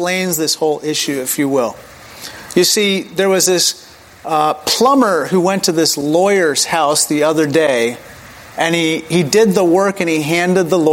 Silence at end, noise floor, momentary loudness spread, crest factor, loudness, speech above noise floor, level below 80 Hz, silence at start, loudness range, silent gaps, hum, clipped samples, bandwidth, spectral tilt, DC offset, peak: 0 s; -36 dBFS; 7 LU; 14 dB; -14 LUFS; 22 dB; -56 dBFS; 0 s; 2 LU; none; none; under 0.1%; 17 kHz; -3.5 dB/octave; under 0.1%; 0 dBFS